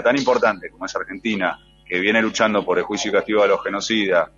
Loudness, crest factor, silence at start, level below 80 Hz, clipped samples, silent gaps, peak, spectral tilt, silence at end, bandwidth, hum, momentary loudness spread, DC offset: -20 LUFS; 18 dB; 0 s; -56 dBFS; under 0.1%; none; -2 dBFS; -3.5 dB/octave; 0.1 s; 7.6 kHz; none; 10 LU; under 0.1%